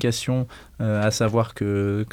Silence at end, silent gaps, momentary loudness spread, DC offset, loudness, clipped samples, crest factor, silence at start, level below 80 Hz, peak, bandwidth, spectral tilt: 0 s; none; 6 LU; under 0.1%; -24 LUFS; under 0.1%; 14 dB; 0 s; -50 dBFS; -8 dBFS; 16 kHz; -5.5 dB/octave